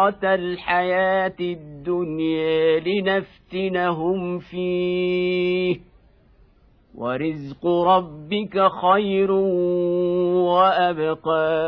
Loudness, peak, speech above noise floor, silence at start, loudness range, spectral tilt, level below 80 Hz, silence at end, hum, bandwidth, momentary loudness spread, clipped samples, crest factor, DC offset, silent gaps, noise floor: -21 LUFS; -4 dBFS; 34 dB; 0 s; 5 LU; -9 dB/octave; -56 dBFS; 0 s; none; 5.4 kHz; 10 LU; under 0.1%; 16 dB; under 0.1%; none; -55 dBFS